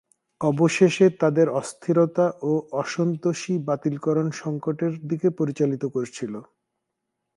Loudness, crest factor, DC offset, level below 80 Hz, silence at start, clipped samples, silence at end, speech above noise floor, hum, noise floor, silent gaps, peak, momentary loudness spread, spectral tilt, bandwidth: -23 LUFS; 18 dB; under 0.1%; -70 dBFS; 0.4 s; under 0.1%; 0.95 s; 58 dB; none; -80 dBFS; none; -4 dBFS; 10 LU; -6.5 dB/octave; 11.5 kHz